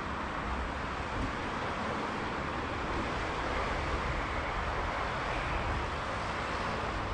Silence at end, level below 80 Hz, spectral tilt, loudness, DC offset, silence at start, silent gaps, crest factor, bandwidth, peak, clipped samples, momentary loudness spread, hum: 0 s; -42 dBFS; -5 dB/octave; -34 LUFS; under 0.1%; 0 s; none; 14 dB; 11 kHz; -20 dBFS; under 0.1%; 2 LU; none